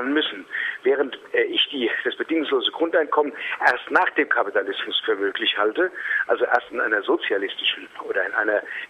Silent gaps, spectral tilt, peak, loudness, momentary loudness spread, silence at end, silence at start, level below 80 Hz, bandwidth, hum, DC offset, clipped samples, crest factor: none; -3.5 dB/octave; -2 dBFS; -22 LUFS; 4 LU; 0.05 s; 0 s; -72 dBFS; 9.8 kHz; none; under 0.1%; under 0.1%; 20 dB